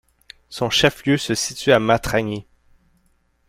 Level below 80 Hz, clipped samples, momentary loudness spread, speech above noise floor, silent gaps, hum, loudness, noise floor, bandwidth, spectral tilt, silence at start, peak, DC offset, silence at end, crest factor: -46 dBFS; under 0.1%; 12 LU; 44 dB; none; none; -19 LUFS; -63 dBFS; 16 kHz; -4 dB/octave; 0.5 s; -2 dBFS; under 0.1%; 1.05 s; 20 dB